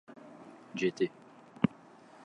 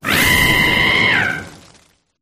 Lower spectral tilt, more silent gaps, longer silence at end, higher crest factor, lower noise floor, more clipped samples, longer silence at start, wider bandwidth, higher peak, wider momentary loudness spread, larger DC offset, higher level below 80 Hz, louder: first, -6.5 dB/octave vs -3 dB/octave; neither; about the same, 0.6 s vs 0.65 s; first, 24 dB vs 14 dB; about the same, -56 dBFS vs -53 dBFS; neither; about the same, 0.1 s vs 0.05 s; second, 9.8 kHz vs 15.5 kHz; second, -12 dBFS vs -2 dBFS; first, 24 LU vs 8 LU; neither; second, -68 dBFS vs -34 dBFS; second, -34 LUFS vs -12 LUFS